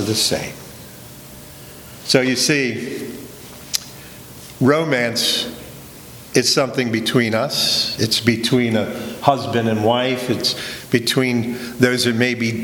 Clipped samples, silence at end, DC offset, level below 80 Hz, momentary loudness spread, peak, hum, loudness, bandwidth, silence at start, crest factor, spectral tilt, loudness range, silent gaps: under 0.1%; 0 s; under 0.1%; -52 dBFS; 21 LU; 0 dBFS; none; -18 LUFS; over 20 kHz; 0 s; 20 dB; -4 dB/octave; 4 LU; none